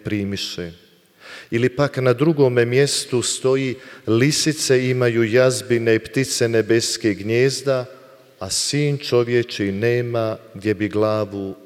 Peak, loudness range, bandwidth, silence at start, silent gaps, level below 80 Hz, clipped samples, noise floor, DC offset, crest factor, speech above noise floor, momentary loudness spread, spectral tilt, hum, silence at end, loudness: -4 dBFS; 3 LU; 16 kHz; 0.05 s; none; -58 dBFS; under 0.1%; -44 dBFS; under 0.1%; 16 dB; 25 dB; 10 LU; -4.5 dB/octave; none; 0.1 s; -19 LUFS